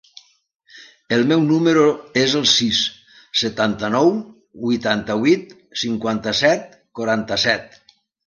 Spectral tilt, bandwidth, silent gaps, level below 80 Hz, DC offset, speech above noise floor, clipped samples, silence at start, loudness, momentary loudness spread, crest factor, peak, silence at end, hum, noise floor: -4 dB/octave; 10 kHz; none; -56 dBFS; under 0.1%; 30 dB; under 0.1%; 0.75 s; -18 LUFS; 9 LU; 18 dB; -2 dBFS; 0.6 s; none; -49 dBFS